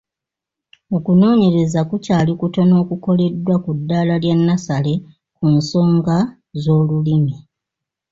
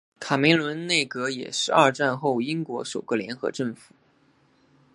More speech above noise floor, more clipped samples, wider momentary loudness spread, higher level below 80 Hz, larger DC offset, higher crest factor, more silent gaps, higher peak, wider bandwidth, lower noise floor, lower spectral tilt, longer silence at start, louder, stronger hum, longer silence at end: first, 70 dB vs 38 dB; neither; second, 8 LU vs 11 LU; first, -50 dBFS vs -72 dBFS; neither; second, 12 dB vs 22 dB; neither; about the same, -4 dBFS vs -2 dBFS; second, 7.6 kHz vs 11.5 kHz; first, -85 dBFS vs -62 dBFS; first, -8 dB/octave vs -4 dB/octave; first, 0.9 s vs 0.2 s; first, -16 LUFS vs -24 LUFS; neither; second, 0.75 s vs 1.2 s